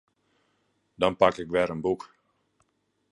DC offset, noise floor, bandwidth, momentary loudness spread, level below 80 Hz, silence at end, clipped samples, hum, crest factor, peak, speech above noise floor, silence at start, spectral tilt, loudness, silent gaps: under 0.1%; -73 dBFS; 11 kHz; 8 LU; -58 dBFS; 1.15 s; under 0.1%; none; 24 dB; -4 dBFS; 48 dB; 1 s; -6 dB/octave; -26 LUFS; none